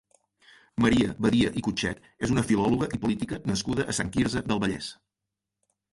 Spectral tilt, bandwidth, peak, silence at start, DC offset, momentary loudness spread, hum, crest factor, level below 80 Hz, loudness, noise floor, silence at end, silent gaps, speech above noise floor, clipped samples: -5 dB/octave; 11.5 kHz; -10 dBFS; 0.75 s; under 0.1%; 8 LU; none; 18 dB; -48 dBFS; -27 LUFS; -86 dBFS; 1 s; none; 60 dB; under 0.1%